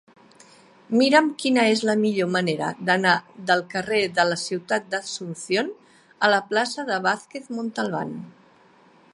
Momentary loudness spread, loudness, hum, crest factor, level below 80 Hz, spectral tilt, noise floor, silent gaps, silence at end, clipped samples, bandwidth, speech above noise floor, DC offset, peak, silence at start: 11 LU; -23 LUFS; none; 22 dB; -72 dBFS; -4 dB/octave; -55 dBFS; none; 0.85 s; under 0.1%; 11.5 kHz; 32 dB; under 0.1%; -2 dBFS; 0.9 s